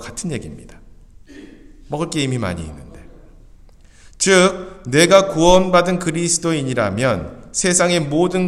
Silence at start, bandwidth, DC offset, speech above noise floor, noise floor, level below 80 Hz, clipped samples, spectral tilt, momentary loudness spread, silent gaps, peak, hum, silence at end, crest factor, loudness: 0 s; 14 kHz; under 0.1%; 28 dB; -44 dBFS; -38 dBFS; under 0.1%; -4 dB/octave; 15 LU; none; 0 dBFS; none; 0 s; 18 dB; -16 LUFS